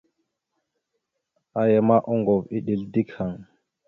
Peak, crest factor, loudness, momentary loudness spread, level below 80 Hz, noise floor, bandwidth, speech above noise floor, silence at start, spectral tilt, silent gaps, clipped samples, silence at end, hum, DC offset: -6 dBFS; 20 dB; -23 LUFS; 13 LU; -60 dBFS; -79 dBFS; 4.1 kHz; 57 dB; 1.55 s; -11 dB/octave; none; under 0.1%; 0.45 s; none; under 0.1%